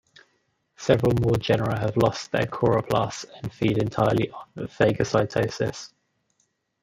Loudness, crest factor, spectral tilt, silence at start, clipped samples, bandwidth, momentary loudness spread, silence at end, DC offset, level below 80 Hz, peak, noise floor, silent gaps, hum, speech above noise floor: -24 LUFS; 22 dB; -6.5 dB/octave; 0.8 s; under 0.1%; 15.5 kHz; 12 LU; 0.95 s; under 0.1%; -50 dBFS; -4 dBFS; -72 dBFS; none; none; 48 dB